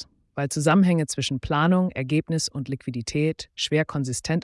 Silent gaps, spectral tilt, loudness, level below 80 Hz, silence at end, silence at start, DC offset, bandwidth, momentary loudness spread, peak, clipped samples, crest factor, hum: none; -5.5 dB/octave; -24 LUFS; -50 dBFS; 0 s; 0 s; under 0.1%; 12 kHz; 11 LU; -8 dBFS; under 0.1%; 16 dB; none